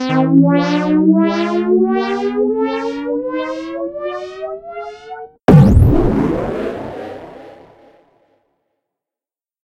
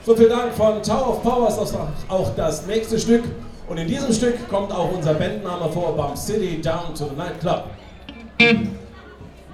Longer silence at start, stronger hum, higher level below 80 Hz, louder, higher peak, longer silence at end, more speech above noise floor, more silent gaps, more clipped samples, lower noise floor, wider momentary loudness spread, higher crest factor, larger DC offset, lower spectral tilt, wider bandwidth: about the same, 0 s vs 0 s; neither; first, -28 dBFS vs -38 dBFS; first, -15 LUFS vs -21 LUFS; about the same, 0 dBFS vs 0 dBFS; first, 2.1 s vs 0 s; first, over 75 dB vs 21 dB; neither; first, 0.1% vs under 0.1%; first, under -90 dBFS vs -41 dBFS; first, 19 LU vs 16 LU; about the same, 16 dB vs 20 dB; neither; first, -8.5 dB/octave vs -5 dB/octave; second, 10.5 kHz vs 15 kHz